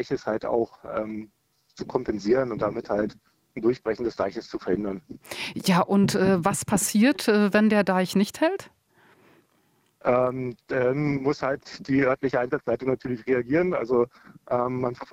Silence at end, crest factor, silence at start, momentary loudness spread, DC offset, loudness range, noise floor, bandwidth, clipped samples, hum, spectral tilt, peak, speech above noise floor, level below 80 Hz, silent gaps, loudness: 0.1 s; 16 dB; 0 s; 12 LU; under 0.1%; 6 LU; -66 dBFS; 16 kHz; under 0.1%; none; -5.5 dB/octave; -8 dBFS; 42 dB; -58 dBFS; none; -25 LUFS